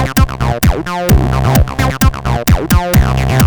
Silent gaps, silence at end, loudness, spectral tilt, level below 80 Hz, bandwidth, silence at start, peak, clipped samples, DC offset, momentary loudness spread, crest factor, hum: none; 0 s; -13 LUFS; -5.5 dB/octave; -16 dBFS; 19.5 kHz; 0 s; 0 dBFS; under 0.1%; under 0.1%; 3 LU; 10 dB; none